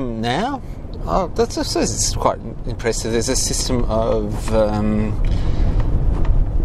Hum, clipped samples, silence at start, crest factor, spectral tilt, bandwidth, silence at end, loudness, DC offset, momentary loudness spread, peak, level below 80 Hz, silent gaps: none; under 0.1%; 0 s; 18 dB; -4.5 dB/octave; 14 kHz; 0 s; -20 LUFS; under 0.1%; 6 LU; 0 dBFS; -22 dBFS; none